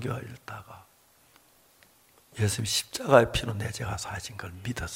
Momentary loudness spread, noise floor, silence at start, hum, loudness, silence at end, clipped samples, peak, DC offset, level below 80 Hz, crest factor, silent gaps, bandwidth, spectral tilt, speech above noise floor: 21 LU; -61 dBFS; 0 s; none; -28 LUFS; 0 s; under 0.1%; -2 dBFS; under 0.1%; -50 dBFS; 28 dB; none; 16.5 kHz; -4 dB/octave; 32 dB